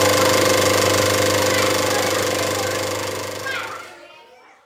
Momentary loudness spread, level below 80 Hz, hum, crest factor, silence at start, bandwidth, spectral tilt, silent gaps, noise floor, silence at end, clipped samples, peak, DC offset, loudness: 11 LU; -56 dBFS; none; 16 dB; 0 s; 16.5 kHz; -2.5 dB/octave; none; -47 dBFS; 0.55 s; under 0.1%; -4 dBFS; under 0.1%; -18 LUFS